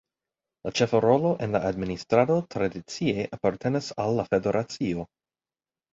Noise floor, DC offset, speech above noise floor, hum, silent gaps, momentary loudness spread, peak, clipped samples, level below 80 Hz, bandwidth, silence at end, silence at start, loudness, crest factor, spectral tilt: under -90 dBFS; under 0.1%; over 65 dB; none; none; 9 LU; -6 dBFS; under 0.1%; -56 dBFS; 7.8 kHz; 0.9 s; 0.65 s; -26 LUFS; 20 dB; -6 dB/octave